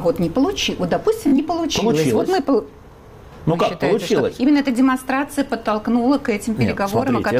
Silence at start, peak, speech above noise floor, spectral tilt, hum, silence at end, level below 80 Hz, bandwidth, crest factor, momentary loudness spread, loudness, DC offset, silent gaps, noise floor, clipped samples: 0 s; -8 dBFS; 23 dB; -5.5 dB/octave; none; 0 s; -44 dBFS; 16 kHz; 10 dB; 5 LU; -19 LUFS; under 0.1%; none; -41 dBFS; under 0.1%